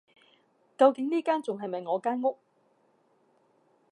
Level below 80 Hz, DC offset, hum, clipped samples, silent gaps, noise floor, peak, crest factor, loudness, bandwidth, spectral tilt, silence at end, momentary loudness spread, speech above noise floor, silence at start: -90 dBFS; under 0.1%; none; under 0.1%; none; -68 dBFS; -8 dBFS; 22 dB; -28 LUFS; 10.5 kHz; -6 dB/octave; 1.6 s; 11 LU; 41 dB; 0.8 s